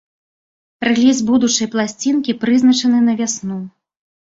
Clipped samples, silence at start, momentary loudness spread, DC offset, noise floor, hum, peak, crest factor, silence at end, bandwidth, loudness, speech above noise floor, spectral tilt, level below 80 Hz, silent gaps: under 0.1%; 0.8 s; 10 LU; under 0.1%; under -90 dBFS; none; -2 dBFS; 14 dB; 0.65 s; 7.8 kHz; -15 LUFS; over 75 dB; -3.5 dB/octave; -58 dBFS; none